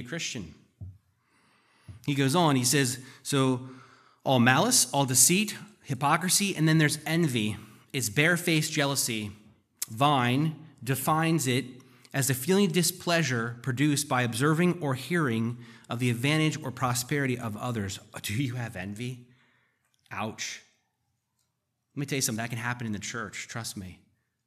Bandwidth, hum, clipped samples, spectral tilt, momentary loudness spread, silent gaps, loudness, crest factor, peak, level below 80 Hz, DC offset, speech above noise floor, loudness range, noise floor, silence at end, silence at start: 15 kHz; none; under 0.1%; -4 dB/octave; 15 LU; none; -27 LUFS; 24 dB; -6 dBFS; -70 dBFS; under 0.1%; 52 dB; 11 LU; -79 dBFS; 0.5 s; 0 s